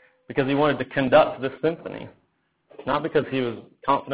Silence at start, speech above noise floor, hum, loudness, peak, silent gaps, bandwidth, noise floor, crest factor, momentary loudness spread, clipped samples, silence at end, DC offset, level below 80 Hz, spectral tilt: 0.3 s; 45 dB; none; -23 LUFS; -4 dBFS; none; 4 kHz; -69 dBFS; 20 dB; 17 LU; under 0.1%; 0 s; under 0.1%; -58 dBFS; -10 dB/octave